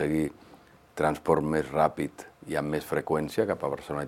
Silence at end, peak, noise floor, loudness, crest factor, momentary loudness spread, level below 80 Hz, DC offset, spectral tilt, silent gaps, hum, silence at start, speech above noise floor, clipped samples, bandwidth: 0 s; -8 dBFS; -51 dBFS; -29 LUFS; 20 dB; 10 LU; -54 dBFS; under 0.1%; -6.5 dB/octave; none; none; 0 s; 23 dB; under 0.1%; 16.5 kHz